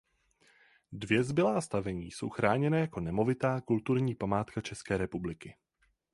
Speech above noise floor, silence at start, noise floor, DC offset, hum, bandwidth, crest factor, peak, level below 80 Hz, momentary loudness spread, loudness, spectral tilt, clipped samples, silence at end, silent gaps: 37 dB; 0.9 s; -69 dBFS; under 0.1%; none; 11.5 kHz; 22 dB; -10 dBFS; -58 dBFS; 11 LU; -32 LUFS; -6.5 dB/octave; under 0.1%; 0.6 s; none